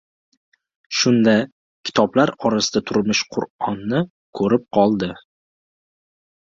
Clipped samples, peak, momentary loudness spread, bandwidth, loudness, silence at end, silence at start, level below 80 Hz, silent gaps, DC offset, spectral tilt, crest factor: under 0.1%; -2 dBFS; 10 LU; 7.6 kHz; -19 LUFS; 1.35 s; 0.9 s; -56 dBFS; 1.52-1.83 s, 3.50-3.59 s, 4.10-4.33 s; under 0.1%; -4.5 dB/octave; 20 dB